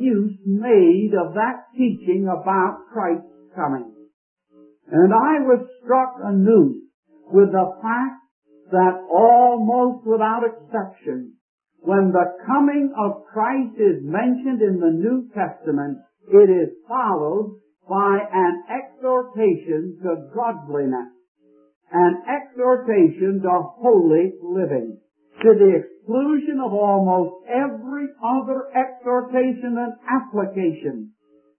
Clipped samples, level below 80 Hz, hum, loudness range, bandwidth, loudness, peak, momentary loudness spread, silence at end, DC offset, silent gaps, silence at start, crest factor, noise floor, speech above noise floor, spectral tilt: under 0.1%; -74 dBFS; none; 5 LU; 3.2 kHz; -19 LUFS; -2 dBFS; 12 LU; 0.5 s; under 0.1%; 4.13-4.37 s, 6.94-7.03 s, 8.31-8.42 s, 11.41-11.58 s, 21.28-21.35 s, 21.76-21.81 s; 0 s; 18 dB; -53 dBFS; 34 dB; -12.5 dB/octave